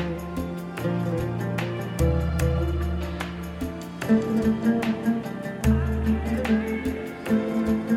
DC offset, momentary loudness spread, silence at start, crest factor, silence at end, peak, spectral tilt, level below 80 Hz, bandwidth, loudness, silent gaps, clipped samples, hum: under 0.1%; 9 LU; 0 s; 16 dB; 0 s; -10 dBFS; -7.5 dB/octave; -34 dBFS; 16 kHz; -26 LUFS; none; under 0.1%; none